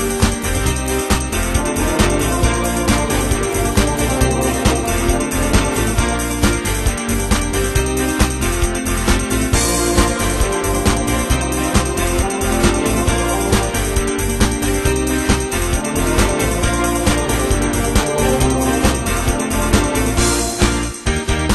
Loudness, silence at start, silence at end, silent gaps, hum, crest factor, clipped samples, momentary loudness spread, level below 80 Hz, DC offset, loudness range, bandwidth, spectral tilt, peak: -17 LUFS; 0 s; 0 s; none; none; 16 dB; under 0.1%; 3 LU; -22 dBFS; under 0.1%; 1 LU; 13 kHz; -4 dB/octave; 0 dBFS